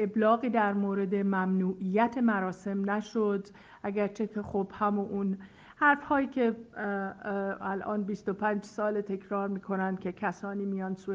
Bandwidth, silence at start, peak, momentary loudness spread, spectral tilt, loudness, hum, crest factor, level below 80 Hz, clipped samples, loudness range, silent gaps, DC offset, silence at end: 7.6 kHz; 0 s; -12 dBFS; 9 LU; -8 dB/octave; -31 LUFS; none; 18 dB; -68 dBFS; under 0.1%; 4 LU; none; under 0.1%; 0 s